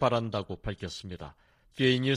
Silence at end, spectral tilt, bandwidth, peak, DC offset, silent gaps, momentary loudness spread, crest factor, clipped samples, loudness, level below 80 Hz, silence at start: 0 s; -6 dB/octave; 11 kHz; -10 dBFS; under 0.1%; none; 19 LU; 20 dB; under 0.1%; -31 LUFS; -52 dBFS; 0 s